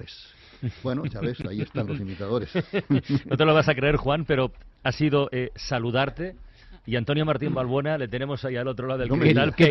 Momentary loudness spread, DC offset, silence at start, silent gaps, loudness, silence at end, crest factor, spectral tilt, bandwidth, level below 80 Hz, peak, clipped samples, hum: 12 LU; under 0.1%; 0 s; none; -25 LUFS; 0 s; 18 dB; -7.5 dB/octave; 6.2 kHz; -46 dBFS; -8 dBFS; under 0.1%; none